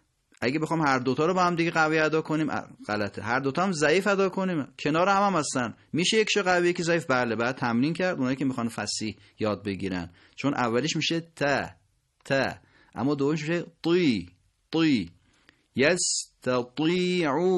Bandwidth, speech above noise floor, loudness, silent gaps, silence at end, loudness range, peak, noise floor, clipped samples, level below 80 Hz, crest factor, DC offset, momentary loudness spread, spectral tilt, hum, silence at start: 12 kHz; 37 dB; -26 LUFS; none; 0 s; 4 LU; -8 dBFS; -62 dBFS; under 0.1%; -62 dBFS; 18 dB; under 0.1%; 9 LU; -4.5 dB/octave; none; 0.4 s